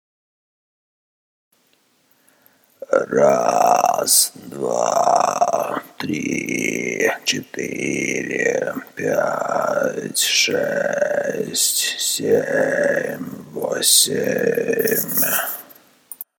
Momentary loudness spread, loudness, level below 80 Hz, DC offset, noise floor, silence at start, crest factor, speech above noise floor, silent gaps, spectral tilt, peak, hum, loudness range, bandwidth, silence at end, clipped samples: 12 LU; -18 LUFS; -68 dBFS; under 0.1%; -61 dBFS; 2.8 s; 20 dB; 42 dB; none; -2 dB/octave; 0 dBFS; none; 4 LU; over 20 kHz; 0.15 s; under 0.1%